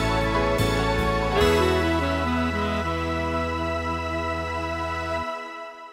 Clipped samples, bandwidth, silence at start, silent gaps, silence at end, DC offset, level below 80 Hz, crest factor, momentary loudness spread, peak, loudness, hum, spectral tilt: under 0.1%; 16 kHz; 0 s; none; 0 s; under 0.1%; -34 dBFS; 16 dB; 7 LU; -8 dBFS; -24 LUFS; none; -5.5 dB/octave